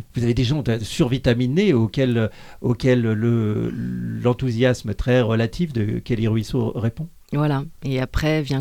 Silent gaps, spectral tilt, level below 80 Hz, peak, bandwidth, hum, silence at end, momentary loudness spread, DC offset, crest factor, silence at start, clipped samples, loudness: none; -7 dB/octave; -38 dBFS; -6 dBFS; 15 kHz; none; 0 s; 8 LU; under 0.1%; 16 dB; 0 s; under 0.1%; -21 LUFS